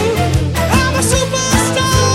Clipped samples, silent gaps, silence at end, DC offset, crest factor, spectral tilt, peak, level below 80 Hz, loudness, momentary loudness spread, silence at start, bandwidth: under 0.1%; none; 0 s; under 0.1%; 14 dB; -4 dB/octave; 0 dBFS; -24 dBFS; -13 LUFS; 2 LU; 0 s; 16.5 kHz